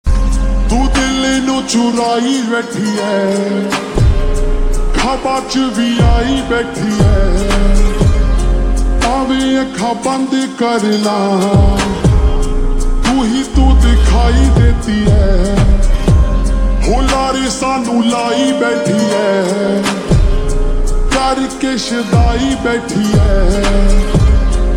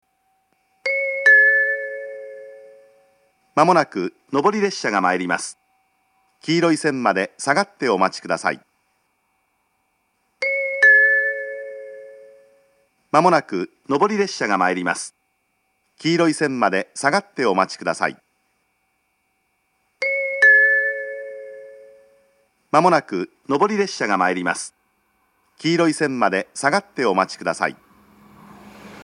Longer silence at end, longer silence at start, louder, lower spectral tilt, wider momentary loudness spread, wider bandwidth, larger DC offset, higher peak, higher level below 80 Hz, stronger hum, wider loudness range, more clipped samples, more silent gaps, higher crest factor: about the same, 0 s vs 0 s; second, 0.05 s vs 0.85 s; first, -13 LUFS vs -18 LUFS; first, -5.5 dB/octave vs -4 dB/octave; second, 5 LU vs 19 LU; about the same, 12 kHz vs 11.5 kHz; neither; about the same, 0 dBFS vs 0 dBFS; first, -14 dBFS vs -74 dBFS; neither; about the same, 3 LU vs 4 LU; neither; neither; second, 10 dB vs 20 dB